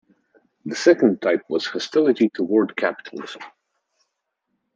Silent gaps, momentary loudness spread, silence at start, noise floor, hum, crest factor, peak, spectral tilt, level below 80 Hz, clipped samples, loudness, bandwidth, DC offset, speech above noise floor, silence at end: none; 19 LU; 0.65 s; -77 dBFS; none; 20 dB; -2 dBFS; -5 dB/octave; -72 dBFS; under 0.1%; -20 LUFS; 7.8 kHz; under 0.1%; 57 dB; 1.25 s